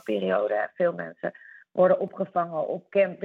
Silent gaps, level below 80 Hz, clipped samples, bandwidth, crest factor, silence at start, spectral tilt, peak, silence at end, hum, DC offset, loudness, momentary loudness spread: none; -82 dBFS; under 0.1%; 4.3 kHz; 16 dB; 0.05 s; -8 dB/octave; -10 dBFS; 0 s; none; under 0.1%; -26 LUFS; 12 LU